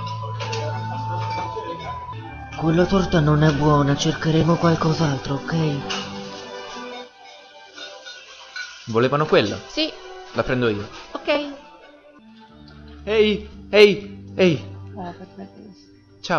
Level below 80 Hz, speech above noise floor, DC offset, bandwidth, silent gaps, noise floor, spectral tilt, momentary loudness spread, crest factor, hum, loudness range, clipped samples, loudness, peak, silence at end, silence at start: -44 dBFS; 30 dB; under 0.1%; 7.2 kHz; none; -49 dBFS; -6 dB/octave; 19 LU; 22 dB; none; 8 LU; under 0.1%; -21 LUFS; 0 dBFS; 0 s; 0 s